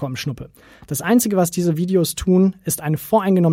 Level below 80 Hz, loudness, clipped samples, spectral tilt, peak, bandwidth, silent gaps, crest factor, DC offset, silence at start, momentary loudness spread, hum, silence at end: -44 dBFS; -19 LUFS; under 0.1%; -6 dB/octave; -4 dBFS; 16.5 kHz; none; 14 dB; under 0.1%; 0 s; 11 LU; none; 0 s